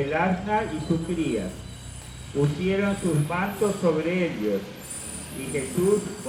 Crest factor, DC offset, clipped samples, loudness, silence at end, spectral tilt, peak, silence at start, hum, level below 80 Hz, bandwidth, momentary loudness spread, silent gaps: 16 dB; under 0.1%; under 0.1%; -26 LUFS; 0 s; -6 dB/octave; -10 dBFS; 0 s; none; -48 dBFS; 16.5 kHz; 12 LU; none